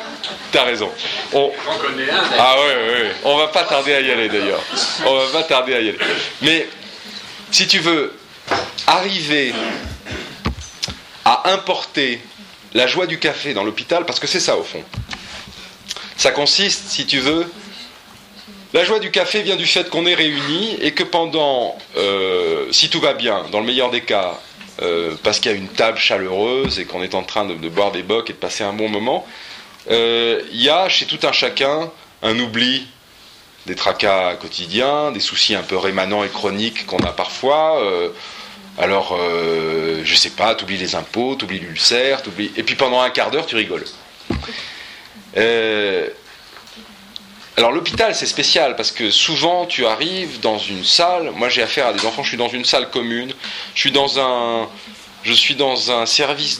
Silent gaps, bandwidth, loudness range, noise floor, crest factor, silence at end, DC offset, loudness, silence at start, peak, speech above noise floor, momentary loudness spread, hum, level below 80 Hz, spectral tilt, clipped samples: none; 16 kHz; 4 LU; -44 dBFS; 18 dB; 0 s; under 0.1%; -17 LUFS; 0 s; 0 dBFS; 27 dB; 14 LU; none; -48 dBFS; -2.5 dB/octave; under 0.1%